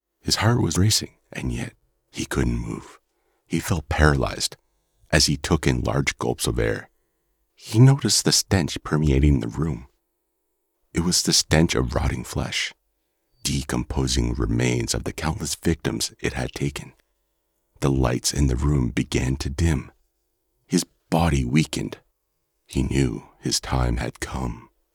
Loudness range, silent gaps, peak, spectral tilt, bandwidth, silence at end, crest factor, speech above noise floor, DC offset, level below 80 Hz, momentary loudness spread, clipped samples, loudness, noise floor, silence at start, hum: 5 LU; none; -4 dBFS; -4.5 dB/octave; 19.5 kHz; 0.35 s; 20 dB; 52 dB; under 0.1%; -34 dBFS; 11 LU; under 0.1%; -23 LUFS; -74 dBFS; 0.25 s; none